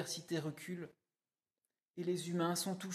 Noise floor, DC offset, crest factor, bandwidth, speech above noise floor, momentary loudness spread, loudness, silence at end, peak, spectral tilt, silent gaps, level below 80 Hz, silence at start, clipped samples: under -90 dBFS; under 0.1%; 18 dB; 14.5 kHz; over 50 dB; 13 LU; -40 LUFS; 0 s; -24 dBFS; -4.5 dB/octave; 1.90-1.94 s; -88 dBFS; 0 s; under 0.1%